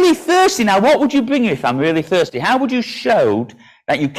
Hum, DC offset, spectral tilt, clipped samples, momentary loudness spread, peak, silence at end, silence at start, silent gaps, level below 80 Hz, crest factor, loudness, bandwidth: none; under 0.1%; -4.5 dB/octave; under 0.1%; 7 LU; -4 dBFS; 0 s; 0 s; none; -54 dBFS; 10 dB; -15 LUFS; 15.5 kHz